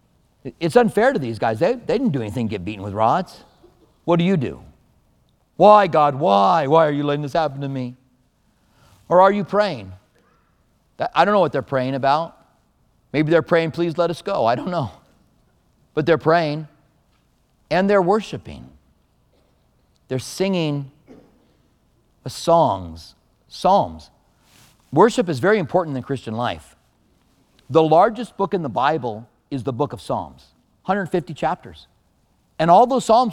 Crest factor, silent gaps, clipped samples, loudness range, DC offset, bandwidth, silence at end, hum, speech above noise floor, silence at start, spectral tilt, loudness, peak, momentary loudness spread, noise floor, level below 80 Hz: 20 dB; none; under 0.1%; 7 LU; under 0.1%; 14 kHz; 0 s; none; 43 dB; 0.45 s; -6.5 dB/octave; -19 LUFS; 0 dBFS; 17 LU; -62 dBFS; -54 dBFS